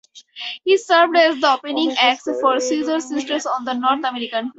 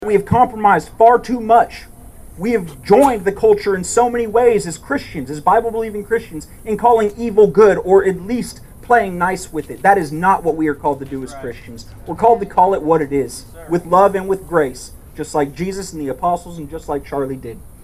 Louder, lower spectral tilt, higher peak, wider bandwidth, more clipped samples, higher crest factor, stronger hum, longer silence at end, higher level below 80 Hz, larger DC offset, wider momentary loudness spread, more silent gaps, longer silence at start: about the same, -18 LUFS vs -16 LUFS; second, -1.5 dB/octave vs -6 dB/octave; about the same, 0 dBFS vs 0 dBFS; second, 8.2 kHz vs 16 kHz; neither; about the same, 18 dB vs 16 dB; neither; about the same, 0.05 s vs 0 s; second, -68 dBFS vs -40 dBFS; neither; second, 9 LU vs 18 LU; neither; first, 0.15 s vs 0 s